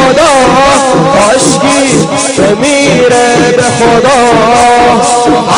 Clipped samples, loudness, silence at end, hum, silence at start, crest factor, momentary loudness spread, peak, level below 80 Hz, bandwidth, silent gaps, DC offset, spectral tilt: 0.9%; -6 LUFS; 0 s; none; 0 s; 6 dB; 3 LU; 0 dBFS; -32 dBFS; 11.5 kHz; none; under 0.1%; -3.5 dB/octave